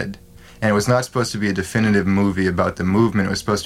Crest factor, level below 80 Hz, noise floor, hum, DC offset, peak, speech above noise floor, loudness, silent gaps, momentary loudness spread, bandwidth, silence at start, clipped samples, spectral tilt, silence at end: 16 dB; -44 dBFS; -39 dBFS; none; under 0.1%; -4 dBFS; 21 dB; -19 LUFS; none; 5 LU; 15.5 kHz; 0 s; under 0.1%; -6 dB/octave; 0 s